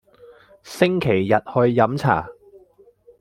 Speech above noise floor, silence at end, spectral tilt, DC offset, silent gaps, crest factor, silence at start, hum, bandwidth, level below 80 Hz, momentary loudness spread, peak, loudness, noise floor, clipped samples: 35 dB; 0.9 s; -7 dB/octave; under 0.1%; none; 20 dB; 0.65 s; none; 15.5 kHz; -54 dBFS; 9 LU; -2 dBFS; -19 LUFS; -53 dBFS; under 0.1%